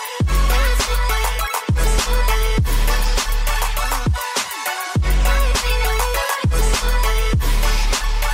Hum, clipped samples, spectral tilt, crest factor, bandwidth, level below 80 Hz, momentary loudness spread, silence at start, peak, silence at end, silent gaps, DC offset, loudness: none; under 0.1%; -3.5 dB/octave; 12 dB; 16.5 kHz; -18 dBFS; 3 LU; 0 s; -6 dBFS; 0 s; none; under 0.1%; -19 LUFS